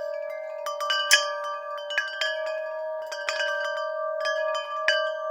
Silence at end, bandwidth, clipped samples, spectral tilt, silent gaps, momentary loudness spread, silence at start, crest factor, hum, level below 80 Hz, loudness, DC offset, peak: 0 s; 17.5 kHz; under 0.1%; 4.5 dB/octave; none; 12 LU; 0 s; 28 dB; none; under -90 dBFS; -27 LUFS; under 0.1%; 0 dBFS